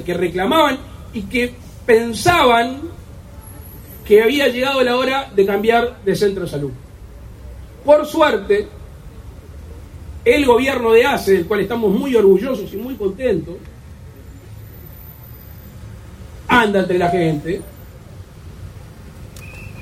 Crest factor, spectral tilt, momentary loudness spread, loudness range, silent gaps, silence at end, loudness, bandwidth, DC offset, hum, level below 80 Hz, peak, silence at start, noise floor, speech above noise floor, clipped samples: 18 dB; -5 dB/octave; 25 LU; 7 LU; none; 0 s; -16 LUFS; 16 kHz; under 0.1%; none; -40 dBFS; 0 dBFS; 0 s; -37 dBFS; 22 dB; under 0.1%